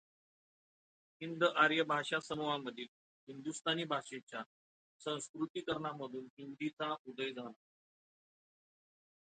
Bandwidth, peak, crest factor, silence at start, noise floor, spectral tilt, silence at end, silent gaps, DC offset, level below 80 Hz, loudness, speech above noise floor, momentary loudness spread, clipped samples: 9 kHz; -16 dBFS; 24 dB; 1.2 s; under -90 dBFS; -4 dB/octave; 1.85 s; 2.88-3.27 s, 4.23-4.27 s, 4.46-4.99 s, 5.29-5.34 s, 5.50-5.54 s, 6.30-6.37 s, 6.73-6.77 s, 6.99-7.05 s; under 0.1%; -82 dBFS; -38 LUFS; over 51 dB; 18 LU; under 0.1%